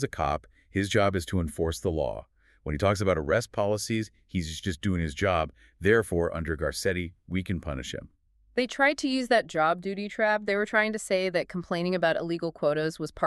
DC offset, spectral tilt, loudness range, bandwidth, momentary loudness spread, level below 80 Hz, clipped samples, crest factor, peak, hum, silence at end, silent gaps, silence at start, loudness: under 0.1%; -5 dB/octave; 3 LU; 13.5 kHz; 9 LU; -46 dBFS; under 0.1%; 18 dB; -10 dBFS; none; 0 s; none; 0 s; -28 LUFS